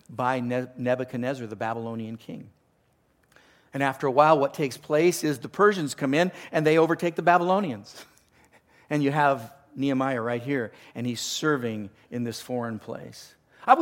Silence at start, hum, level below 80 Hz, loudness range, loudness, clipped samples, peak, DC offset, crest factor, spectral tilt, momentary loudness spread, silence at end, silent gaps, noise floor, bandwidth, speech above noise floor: 0.1 s; none; -72 dBFS; 8 LU; -25 LUFS; under 0.1%; -4 dBFS; under 0.1%; 22 dB; -5.5 dB/octave; 16 LU; 0 s; none; -66 dBFS; 17 kHz; 41 dB